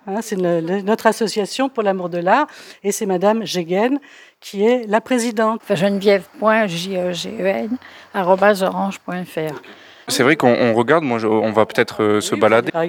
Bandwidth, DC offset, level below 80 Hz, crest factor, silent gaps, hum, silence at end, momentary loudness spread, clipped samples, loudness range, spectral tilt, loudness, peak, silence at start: 19.5 kHz; under 0.1%; -68 dBFS; 18 dB; none; none; 0 s; 11 LU; under 0.1%; 2 LU; -5 dB/octave; -18 LUFS; 0 dBFS; 0.05 s